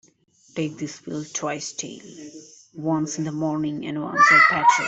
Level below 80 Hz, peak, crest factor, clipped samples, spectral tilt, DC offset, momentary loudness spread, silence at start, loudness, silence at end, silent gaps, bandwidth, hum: -66 dBFS; -4 dBFS; 20 dB; under 0.1%; -3.5 dB/octave; under 0.1%; 22 LU; 0.55 s; -21 LUFS; 0 s; none; 8.4 kHz; none